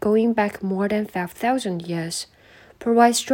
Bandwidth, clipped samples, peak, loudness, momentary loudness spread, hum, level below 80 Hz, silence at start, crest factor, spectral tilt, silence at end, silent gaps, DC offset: 17 kHz; under 0.1%; -4 dBFS; -22 LUFS; 12 LU; none; -58 dBFS; 0 s; 18 dB; -4.5 dB/octave; 0 s; none; under 0.1%